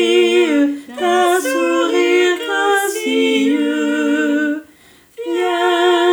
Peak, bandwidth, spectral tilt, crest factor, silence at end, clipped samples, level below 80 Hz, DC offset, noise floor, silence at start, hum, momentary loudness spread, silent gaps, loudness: -2 dBFS; over 20 kHz; -2 dB/octave; 12 dB; 0 s; under 0.1%; -68 dBFS; under 0.1%; -47 dBFS; 0 s; none; 6 LU; none; -15 LUFS